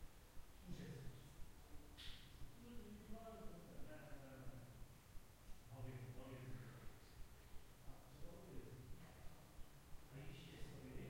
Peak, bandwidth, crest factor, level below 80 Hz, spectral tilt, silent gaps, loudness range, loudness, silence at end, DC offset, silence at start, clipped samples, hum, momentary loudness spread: -38 dBFS; 16 kHz; 16 dB; -62 dBFS; -5.5 dB/octave; none; 2 LU; -60 LUFS; 0 s; under 0.1%; 0 s; under 0.1%; none; 8 LU